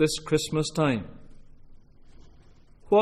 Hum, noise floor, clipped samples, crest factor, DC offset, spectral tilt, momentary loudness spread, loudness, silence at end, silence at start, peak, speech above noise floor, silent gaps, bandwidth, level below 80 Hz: none; -52 dBFS; under 0.1%; 18 dB; under 0.1%; -5 dB/octave; 8 LU; -26 LUFS; 0 s; 0 s; -10 dBFS; 27 dB; none; 13 kHz; -50 dBFS